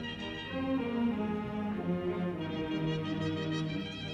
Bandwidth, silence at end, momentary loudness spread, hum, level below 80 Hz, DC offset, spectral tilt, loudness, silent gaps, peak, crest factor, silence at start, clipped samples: 8.6 kHz; 0 s; 4 LU; 50 Hz at -50 dBFS; -58 dBFS; under 0.1%; -7 dB/octave; -35 LUFS; none; -22 dBFS; 12 dB; 0 s; under 0.1%